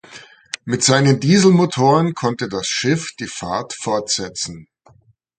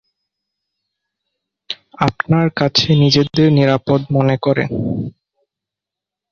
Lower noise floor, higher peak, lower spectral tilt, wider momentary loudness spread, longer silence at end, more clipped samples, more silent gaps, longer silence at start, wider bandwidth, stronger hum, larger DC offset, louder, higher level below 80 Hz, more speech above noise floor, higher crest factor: second, -54 dBFS vs -85 dBFS; about the same, 0 dBFS vs -2 dBFS; second, -4.5 dB/octave vs -6.5 dB/octave; about the same, 14 LU vs 14 LU; second, 0.75 s vs 1.2 s; neither; neither; second, 0.1 s vs 1.7 s; first, 9.6 kHz vs 7 kHz; neither; neither; about the same, -17 LUFS vs -15 LUFS; second, -54 dBFS vs -48 dBFS; second, 37 dB vs 71 dB; about the same, 18 dB vs 16 dB